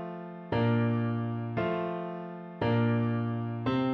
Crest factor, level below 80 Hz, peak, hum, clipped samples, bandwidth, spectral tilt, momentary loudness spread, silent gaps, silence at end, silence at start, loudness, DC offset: 12 dB; -62 dBFS; -18 dBFS; none; under 0.1%; 5.2 kHz; -10 dB/octave; 12 LU; none; 0 s; 0 s; -31 LUFS; under 0.1%